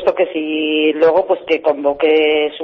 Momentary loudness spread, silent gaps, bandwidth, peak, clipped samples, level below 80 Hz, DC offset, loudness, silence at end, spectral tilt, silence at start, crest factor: 5 LU; none; 5.6 kHz; -2 dBFS; under 0.1%; -56 dBFS; under 0.1%; -15 LUFS; 0 s; -6 dB/octave; 0 s; 12 dB